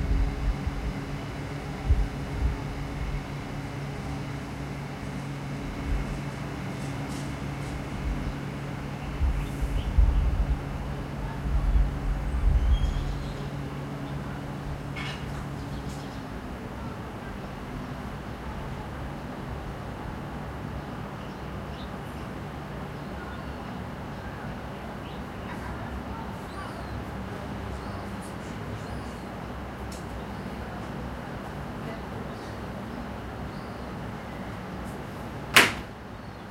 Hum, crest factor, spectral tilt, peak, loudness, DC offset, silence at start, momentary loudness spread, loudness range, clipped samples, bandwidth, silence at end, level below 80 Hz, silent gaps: none; 30 dB; -5 dB/octave; 0 dBFS; -33 LUFS; under 0.1%; 0 s; 9 LU; 8 LU; under 0.1%; 16 kHz; 0 s; -34 dBFS; none